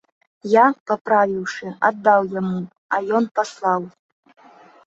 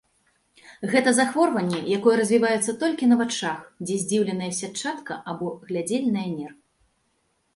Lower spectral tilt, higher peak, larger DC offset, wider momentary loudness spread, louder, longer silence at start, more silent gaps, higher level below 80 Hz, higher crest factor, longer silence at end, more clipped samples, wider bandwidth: first, -6 dB/octave vs -4.5 dB/octave; first, -2 dBFS vs -6 dBFS; neither; about the same, 12 LU vs 12 LU; first, -20 LUFS vs -24 LUFS; second, 0.45 s vs 0.65 s; first, 0.80-0.86 s, 1.01-1.05 s, 2.78-2.89 s, 3.31-3.35 s vs none; about the same, -68 dBFS vs -68 dBFS; about the same, 18 dB vs 20 dB; about the same, 0.95 s vs 1.05 s; neither; second, 8 kHz vs 11.5 kHz